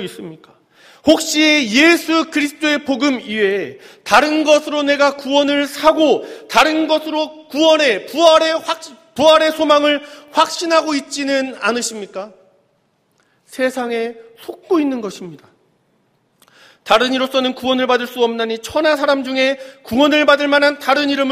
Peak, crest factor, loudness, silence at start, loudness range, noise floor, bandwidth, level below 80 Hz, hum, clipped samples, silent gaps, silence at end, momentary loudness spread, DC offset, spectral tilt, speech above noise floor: 0 dBFS; 16 dB; -15 LUFS; 0 s; 9 LU; -62 dBFS; 15.5 kHz; -56 dBFS; none; under 0.1%; none; 0 s; 15 LU; under 0.1%; -2.5 dB/octave; 46 dB